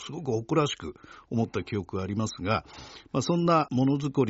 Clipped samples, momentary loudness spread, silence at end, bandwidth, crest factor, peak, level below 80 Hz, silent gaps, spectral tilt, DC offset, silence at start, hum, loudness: under 0.1%; 11 LU; 0 s; 8 kHz; 18 dB; -10 dBFS; -60 dBFS; none; -6 dB/octave; under 0.1%; 0 s; none; -28 LUFS